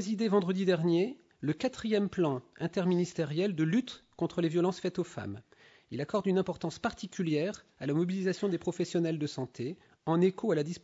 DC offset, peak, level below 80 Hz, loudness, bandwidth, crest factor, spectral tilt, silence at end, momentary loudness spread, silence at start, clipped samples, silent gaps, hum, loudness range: under 0.1%; -16 dBFS; -68 dBFS; -32 LUFS; 8 kHz; 16 dB; -6.5 dB/octave; 0.05 s; 10 LU; 0 s; under 0.1%; none; none; 3 LU